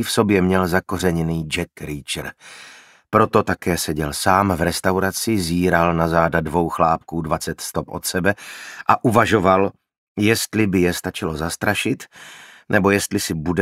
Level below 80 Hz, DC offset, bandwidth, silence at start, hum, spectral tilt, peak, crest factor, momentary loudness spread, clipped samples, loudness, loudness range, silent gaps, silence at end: -42 dBFS; under 0.1%; 16 kHz; 0 s; none; -5 dB/octave; 0 dBFS; 20 dB; 11 LU; under 0.1%; -19 LUFS; 3 LU; 9.98-10.15 s; 0 s